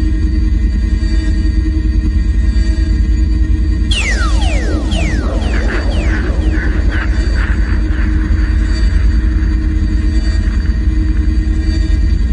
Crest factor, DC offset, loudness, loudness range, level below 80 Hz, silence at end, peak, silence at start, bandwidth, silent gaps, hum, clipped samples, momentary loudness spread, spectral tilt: 10 dB; under 0.1%; -15 LUFS; 1 LU; -12 dBFS; 0 s; -2 dBFS; 0 s; 10 kHz; none; none; under 0.1%; 2 LU; -6.5 dB/octave